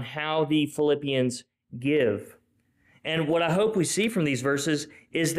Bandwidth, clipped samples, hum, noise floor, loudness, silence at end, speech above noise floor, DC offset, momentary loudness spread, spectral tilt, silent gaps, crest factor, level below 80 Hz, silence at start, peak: 15.5 kHz; under 0.1%; none; -67 dBFS; -26 LUFS; 0 s; 42 dB; under 0.1%; 9 LU; -4.5 dB/octave; none; 12 dB; -64 dBFS; 0 s; -14 dBFS